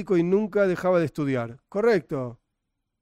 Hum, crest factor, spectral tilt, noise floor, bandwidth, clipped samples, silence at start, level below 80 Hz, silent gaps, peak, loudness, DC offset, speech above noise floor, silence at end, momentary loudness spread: none; 14 dB; -8 dB/octave; -80 dBFS; 13 kHz; under 0.1%; 0 s; -60 dBFS; none; -12 dBFS; -24 LUFS; under 0.1%; 56 dB; 0.65 s; 10 LU